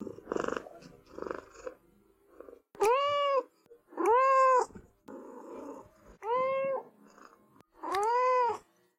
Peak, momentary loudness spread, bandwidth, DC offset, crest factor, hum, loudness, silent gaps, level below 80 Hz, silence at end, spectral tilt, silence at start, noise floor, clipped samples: -16 dBFS; 23 LU; 15.5 kHz; under 0.1%; 16 dB; none; -29 LUFS; none; -68 dBFS; 0.4 s; -3.5 dB/octave; 0 s; -65 dBFS; under 0.1%